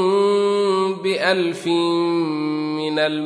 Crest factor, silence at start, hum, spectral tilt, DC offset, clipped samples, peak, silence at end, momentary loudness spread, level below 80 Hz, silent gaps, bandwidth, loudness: 14 dB; 0 s; none; -5.5 dB/octave; under 0.1%; under 0.1%; -4 dBFS; 0 s; 5 LU; -76 dBFS; none; 11 kHz; -20 LUFS